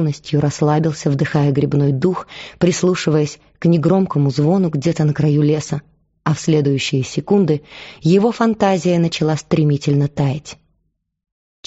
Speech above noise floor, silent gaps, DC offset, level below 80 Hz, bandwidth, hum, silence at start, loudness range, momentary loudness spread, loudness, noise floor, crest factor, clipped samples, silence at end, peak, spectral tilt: 52 dB; none; under 0.1%; -50 dBFS; 8 kHz; none; 0 s; 1 LU; 7 LU; -17 LUFS; -68 dBFS; 14 dB; under 0.1%; 1.15 s; -2 dBFS; -7 dB/octave